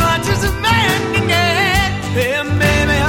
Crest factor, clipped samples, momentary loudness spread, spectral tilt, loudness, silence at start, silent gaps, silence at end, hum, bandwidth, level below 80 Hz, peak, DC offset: 14 dB; under 0.1%; 4 LU; -4.5 dB/octave; -14 LUFS; 0 s; none; 0 s; none; 17 kHz; -28 dBFS; 0 dBFS; under 0.1%